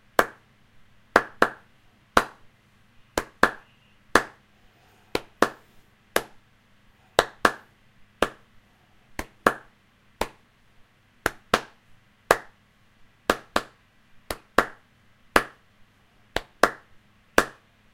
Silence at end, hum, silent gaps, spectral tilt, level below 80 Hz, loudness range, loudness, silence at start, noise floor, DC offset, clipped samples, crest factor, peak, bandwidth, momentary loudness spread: 0.45 s; none; none; -3 dB/octave; -50 dBFS; 4 LU; -26 LUFS; 0.2 s; -60 dBFS; under 0.1%; under 0.1%; 30 dB; 0 dBFS; 16 kHz; 15 LU